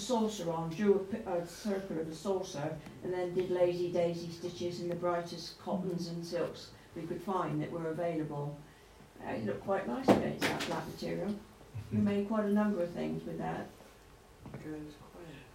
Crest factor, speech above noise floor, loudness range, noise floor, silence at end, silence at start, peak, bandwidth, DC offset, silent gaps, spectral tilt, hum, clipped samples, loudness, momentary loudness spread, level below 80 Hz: 24 dB; 23 dB; 4 LU; -57 dBFS; 0 s; 0 s; -12 dBFS; 16 kHz; under 0.1%; none; -6 dB/octave; none; under 0.1%; -35 LUFS; 15 LU; -64 dBFS